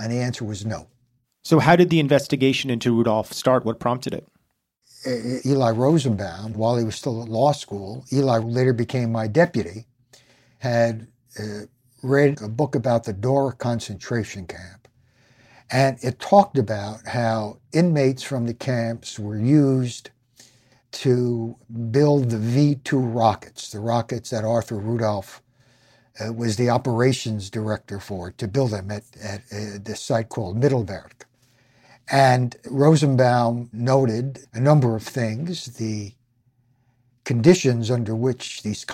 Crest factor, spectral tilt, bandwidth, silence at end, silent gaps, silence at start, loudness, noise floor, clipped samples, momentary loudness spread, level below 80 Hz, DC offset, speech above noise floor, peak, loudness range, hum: 20 dB; -6.5 dB/octave; 14.5 kHz; 0 s; none; 0 s; -22 LUFS; -71 dBFS; under 0.1%; 15 LU; -58 dBFS; under 0.1%; 49 dB; -2 dBFS; 6 LU; none